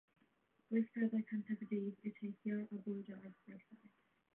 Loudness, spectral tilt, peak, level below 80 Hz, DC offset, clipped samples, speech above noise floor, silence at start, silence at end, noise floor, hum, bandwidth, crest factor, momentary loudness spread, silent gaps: -43 LUFS; -9 dB/octave; -26 dBFS; under -90 dBFS; under 0.1%; under 0.1%; 35 dB; 0.7 s; 0.6 s; -78 dBFS; none; 3.5 kHz; 18 dB; 18 LU; none